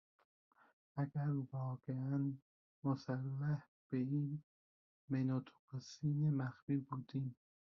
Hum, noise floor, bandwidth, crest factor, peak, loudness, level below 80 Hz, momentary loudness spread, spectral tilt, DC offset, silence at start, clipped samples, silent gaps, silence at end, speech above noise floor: none; under -90 dBFS; 7 kHz; 16 dB; -26 dBFS; -42 LUFS; -80 dBFS; 10 LU; -9 dB/octave; under 0.1%; 0.95 s; under 0.1%; 2.42-2.82 s, 3.68-3.90 s, 4.43-5.08 s, 5.59-5.68 s, 6.62-6.67 s; 0.45 s; over 50 dB